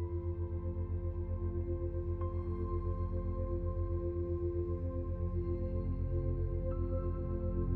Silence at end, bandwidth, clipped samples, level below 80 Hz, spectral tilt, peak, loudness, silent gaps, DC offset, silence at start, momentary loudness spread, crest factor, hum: 0 s; 2.6 kHz; under 0.1%; -40 dBFS; -13 dB/octave; -22 dBFS; -38 LUFS; none; under 0.1%; 0 s; 2 LU; 12 dB; none